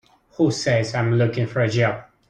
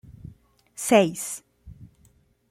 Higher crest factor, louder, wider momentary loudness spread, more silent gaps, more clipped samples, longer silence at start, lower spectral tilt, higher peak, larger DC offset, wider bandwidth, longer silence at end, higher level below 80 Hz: second, 14 dB vs 22 dB; about the same, -21 LUFS vs -23 LUFS; second, 3 LU vs 26 LU; neither; neither; second, 0.4 s vs 0.8 s; first, -6 dB/octave vs -4 dB/octave; about the same, -6 dBFS vs -4 dBFS; neither; second, 9 kHz vs 16 kHz; second, 0.25 s vs 0.65 s; about the same, -54 dBFS vs -56 dBFS